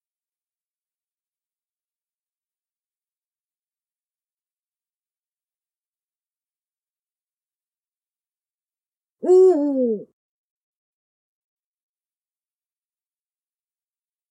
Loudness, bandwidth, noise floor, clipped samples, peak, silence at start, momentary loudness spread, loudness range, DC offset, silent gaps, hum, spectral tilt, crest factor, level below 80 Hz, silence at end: -17 LUFS; 8.2 kHz; under -90 dBFS; under 0.1%; -8 dBFS; 9.25 s; 14 LU; 9 LU; under 0.1%; none; none; -7.5 dB/octave; 22 dB; under -90 dBFS; 4.25 s